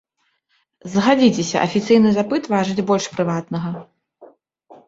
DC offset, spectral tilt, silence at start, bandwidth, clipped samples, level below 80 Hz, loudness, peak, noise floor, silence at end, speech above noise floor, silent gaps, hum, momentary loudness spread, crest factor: under 0.1%; -5.5 dB/octave; 0.85 s; 7.8 kHz; under 0.1%; -58 dBFS; -18 LUFS; -2 dBFS; -68 dBFS; 0.15 s; 50 dB; none; none; 12 LU; 18 dB